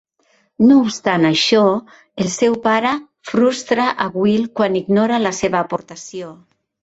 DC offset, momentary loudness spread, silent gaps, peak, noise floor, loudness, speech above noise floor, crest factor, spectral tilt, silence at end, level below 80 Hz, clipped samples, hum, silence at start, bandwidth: under 0.1%; 14 LU; none; -2 dBFS; -60 dBFS; -16 LUFS; 44 dB; 16 dB; -4.5 dB/octave; 0.5 s; -56 dBFS; under 0.1%; none; 0.6 s; 8.2 kHz